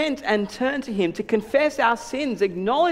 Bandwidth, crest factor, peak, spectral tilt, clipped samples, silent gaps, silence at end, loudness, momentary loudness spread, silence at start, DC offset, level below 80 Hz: 15.5 kHz; 18 dB; -6 dBFS; -5 dB/octave; under 0.1%; none; 0 s; -23 LUFS; 5 LU; 0 s; under 0.1%; -56 dBFS